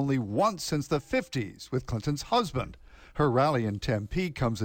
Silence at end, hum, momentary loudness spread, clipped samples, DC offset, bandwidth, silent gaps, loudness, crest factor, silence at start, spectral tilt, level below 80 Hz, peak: 0 s; none; 9 LU; under 0.1%; under 0.1%; 17 kHz; none; -29 LUFS; 14 dB; 0 s; -6 dB/octave; -48 dBFS; -14 dBFS